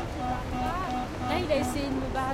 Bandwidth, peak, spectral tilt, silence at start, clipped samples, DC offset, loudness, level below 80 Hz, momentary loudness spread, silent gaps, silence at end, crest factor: 16 kHz; -14 dBFS; -5.5 dB/octave; 0 s; under 0.1%; under 0.1%; -30 LUFS; -40 dBFS; 5 LU; none; 0 s; 14 dB